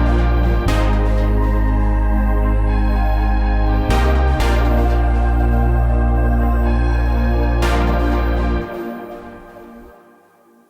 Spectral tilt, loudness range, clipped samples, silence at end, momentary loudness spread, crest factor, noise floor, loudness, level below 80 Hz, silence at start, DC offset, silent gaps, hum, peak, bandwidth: -7.5 dB/octave; 3 LU; under 0.1%; 0.8 s; 8 LU; 12 dB; -51 dBFS; -18 LUFS; -16 dBFS; 0 s; under 0.1%; none; none; -4 dBFS; 8.4 kHz